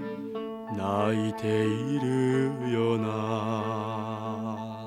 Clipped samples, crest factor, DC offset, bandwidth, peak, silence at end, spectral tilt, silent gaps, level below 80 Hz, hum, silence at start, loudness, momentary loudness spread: under 0.1%; 16 dB; under 0.1%; 13.5 kHz; -12 dBFS; 0 s; -7 dB/octave; none; -70 dBFS; none; 0 s; -29 LUFS; 9 LU